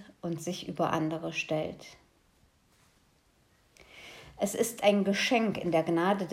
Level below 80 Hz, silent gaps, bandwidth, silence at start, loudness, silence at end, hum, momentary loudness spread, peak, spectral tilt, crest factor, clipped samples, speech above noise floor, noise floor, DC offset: -68 dBFS; none; 16 kHz; 0 s; -30 LUFS; 0 s; none; 21 LU; -12 dBFS; -4.5 dB/octave; 20 dB; under 0.1%; 37 dB; -67 dBFS; under 0.1%